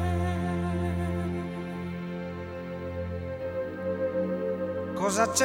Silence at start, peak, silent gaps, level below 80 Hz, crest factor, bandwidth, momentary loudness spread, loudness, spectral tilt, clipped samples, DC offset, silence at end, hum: 0 s; -8 dBFS; none; -48 dBFS; 20 dB; 16.5 kHz; 7 LU; -31 LUFS; -5 dB/octave; under 0.1%; under 0.1%; 0 s; none